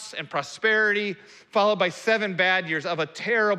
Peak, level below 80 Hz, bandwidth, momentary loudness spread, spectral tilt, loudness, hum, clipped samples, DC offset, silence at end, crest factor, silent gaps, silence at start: -8 dBFS; -80 dBFS; 12.5 kHz; 9 LU; -4 dB/octave; -24 LUFS; none; under 0.1%; under 0.1%; 0 s; 16 dB; none; 0 s